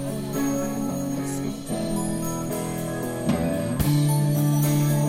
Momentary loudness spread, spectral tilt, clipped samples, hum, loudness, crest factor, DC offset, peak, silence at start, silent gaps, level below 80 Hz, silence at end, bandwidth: 8 LU; -6 dB/octave; under 0.1%; none; -25 LUFS; 16 dB; under 0.1%; -8 dBFS; 0 s; none; -44 dBFS; 0 s; 16.5 kHz